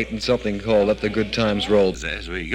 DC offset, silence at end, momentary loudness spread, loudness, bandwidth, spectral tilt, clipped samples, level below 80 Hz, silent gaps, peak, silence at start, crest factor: under 0.1%; 0 s; 8 LU; -21 LUFS; 10.5 kHz; -5.5 dB/octave; under 0.1%; -38 dBFS; none; -8 dBFS; 0 s; 14 dB